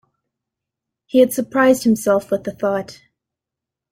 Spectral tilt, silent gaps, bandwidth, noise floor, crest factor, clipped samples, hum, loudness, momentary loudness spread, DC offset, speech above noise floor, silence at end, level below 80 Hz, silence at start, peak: -5 dB/octave; none; 16.5 kHz; -85 dBFS; 18 dB; under 0.1%; none; -17 LUFS; 9 LU; under 0.1%; 69 dB; 1 s; -60 dBFS; 1.15 s; -2 dBFS